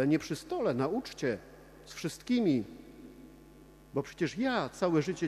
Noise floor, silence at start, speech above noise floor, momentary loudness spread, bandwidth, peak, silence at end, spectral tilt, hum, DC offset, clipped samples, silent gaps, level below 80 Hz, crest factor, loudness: -55 dBFS; 0 s; 24 dB; 22 LU; 14.5 kHz; -16 dBFS; 0 s; -6 dB/octave; none; under 0.1%; under 0.1%; none; -62 dBFS; 18 dB; -33 LUFS